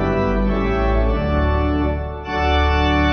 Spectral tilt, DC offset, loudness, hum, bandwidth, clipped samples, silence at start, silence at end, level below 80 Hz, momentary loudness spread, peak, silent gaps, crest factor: -7.5 dB/octave; under 0.1%; -19 LUFS; none; 6.2 kHz; under 0.1%; 0 s; 0 s; -22 dBFS; 5 LU; -6 dBFS; none; 12 dB